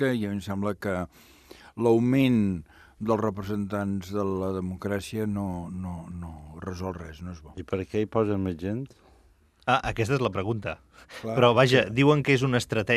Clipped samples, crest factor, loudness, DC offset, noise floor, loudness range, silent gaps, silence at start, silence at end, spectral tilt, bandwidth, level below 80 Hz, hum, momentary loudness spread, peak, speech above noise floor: under 0.1%; 22 dB; -26 LUFS; under 0.1%; -60 dBFS; 9 LU; none; 0 s; 0 s; -6.5 dB/octave; 14.5 kHz; -54 dBFS; none; 18 LU; -4 dBFS; 34 dB